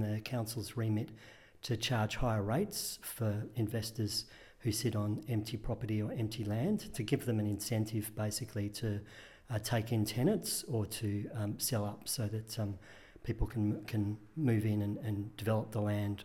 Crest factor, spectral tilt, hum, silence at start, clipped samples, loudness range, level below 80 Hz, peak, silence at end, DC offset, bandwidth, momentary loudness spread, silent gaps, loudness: 18 dB; -5.5 dB/octave; none; 0 s; under 0.1%; 1 LU; -52 dBFS; -18 dBFS; 0 s; under 0.1%; 17 kHz; 7 LU; none; -36 LUFS